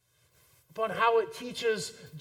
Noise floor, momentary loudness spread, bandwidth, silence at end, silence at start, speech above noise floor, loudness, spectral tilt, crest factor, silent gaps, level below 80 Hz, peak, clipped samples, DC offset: -66 dBFS; 13 LU; 16 kHz; 0 s; 0.75 s; 36 dB; -30 LUFS; -3 dB/octave; 20 dB; none; -72 dBFS; -12 dBFS; under 0.1%; under 0.1%